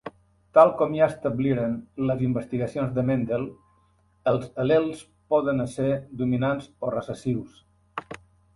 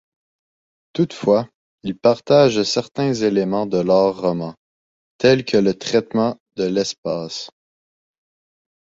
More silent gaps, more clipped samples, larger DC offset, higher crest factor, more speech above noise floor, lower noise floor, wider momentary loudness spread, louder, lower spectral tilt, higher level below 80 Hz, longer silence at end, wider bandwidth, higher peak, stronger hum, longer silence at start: second, none vs 1.55-1.78 s, 4.57-5.19 s, 6.40-6.46 s, 6.98-7.03 s; neither; neither; about the same, 22 dB vs 18 dB; second, 39 dB vs over 72 dB; second, -63 dBFS vs under -90 dBFS; about the same, 16 LU vs 15 LU; second, -25 LUFS vs -19 LUFS; first, -8 dB/octave vs -5.5 dB/octave; about the same, -56 dBFS vs -58 dBFS; second, 0.4 s vs 1.35 s; first, 11.5 kHz vs 7.8 kHz; about the same, -4 dBFS vs -2 dBFS; neither; second, 0.05 s vs 0.95 s